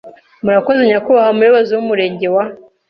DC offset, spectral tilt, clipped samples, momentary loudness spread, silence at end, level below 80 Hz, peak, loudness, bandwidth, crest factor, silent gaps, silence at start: under 0.1%; -8 dB/octave; under 0.1%; 7 LU; 0.35 s; -58 dBFS; -2 dBFS; -13 LUFS; 5.8 kHz; 12 dB; none; 0.05 s